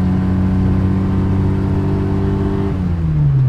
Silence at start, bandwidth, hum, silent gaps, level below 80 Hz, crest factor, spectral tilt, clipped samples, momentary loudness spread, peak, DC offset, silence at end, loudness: 0 s; 5.8 kHz; none; none; -26 dBFS; 10 dB; -10 dB/octave; under 0.1%; 3 LU; -4 dBFS; under 0.1%; 0 s; -17 LUFS